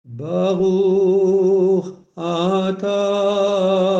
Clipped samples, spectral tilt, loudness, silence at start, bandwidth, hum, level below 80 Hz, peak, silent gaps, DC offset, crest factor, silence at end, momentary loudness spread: under 0.1%; -7 dB/octave; -18 LUFS; 0.1 s; 7.8 kHz; none; -62 dBFS; -6 dBFS; none; under 0.1%; 10 dB; 0 s; 7 LU